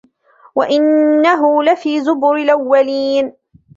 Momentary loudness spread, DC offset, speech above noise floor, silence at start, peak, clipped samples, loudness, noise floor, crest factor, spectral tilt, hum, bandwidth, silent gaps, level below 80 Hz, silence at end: 7 LU; under 0.1%; 36 dB; 0.55 s; -2 dBFS; under 0.1%; -14 LUFS; -48 dBFS; 12 dB; -4.5 dB/octave; none; 7.6 kHz; none; -62 dBFS; 0.45 s